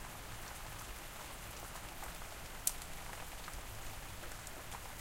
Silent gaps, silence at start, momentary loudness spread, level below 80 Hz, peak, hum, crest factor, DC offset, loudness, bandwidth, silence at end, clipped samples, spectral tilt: none; 0 s; 9 LU; -52 dBFS; -8 dBFS; none; 38 dB; under 0.1%; -46 LUFS; 17 kHz; 0 s; under 0.1%; -2 dB/octave